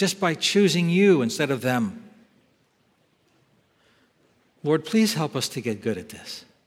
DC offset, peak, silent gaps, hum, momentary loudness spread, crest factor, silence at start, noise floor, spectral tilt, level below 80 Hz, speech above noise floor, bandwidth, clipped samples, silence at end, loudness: under 0.1%; -6 dBFS; none; none; 15 LU; 18 dB; 0 s; -66 dBFS; -5 dB/octave; -70 dBFS; 43 dB; 16.5 kHz; under 0.1%; 0.25 s; -23 LUFS